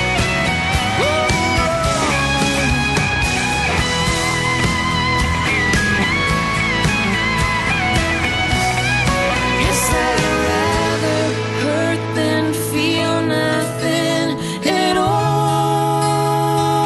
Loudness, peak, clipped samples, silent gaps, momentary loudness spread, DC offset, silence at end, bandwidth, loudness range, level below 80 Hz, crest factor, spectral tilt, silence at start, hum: -16 LUFS; -2 dBFS; under 0.1%; none; 3 LU; under 0.1%; 0 s; 12.5 kHz; 2 LU; -30 dBFS; 16 dB; -4 dB/octave; 0 s; none